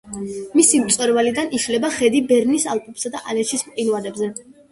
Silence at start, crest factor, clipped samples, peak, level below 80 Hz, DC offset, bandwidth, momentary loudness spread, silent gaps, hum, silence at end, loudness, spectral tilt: 0.05 s; 18 dB; under 0.1%; 0 dBFS; -58 dBFS; under 0.1%; 12 kHz; 13 LU; none; none; 0.3 s; -19 LUFS; -2.5 dB/octave